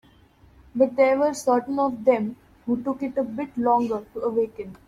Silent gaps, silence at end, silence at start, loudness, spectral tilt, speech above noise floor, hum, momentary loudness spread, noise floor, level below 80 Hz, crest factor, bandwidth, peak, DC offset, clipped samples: none; 0.1 s; 0.75 s; -24 LUFS; -6 dB/octave; 32 dB; none; 10 LU; -55 dBFS; -60 dBFS; 18 dB; 13 kHz; -6 dBFS; under 0.1%; under 0.1%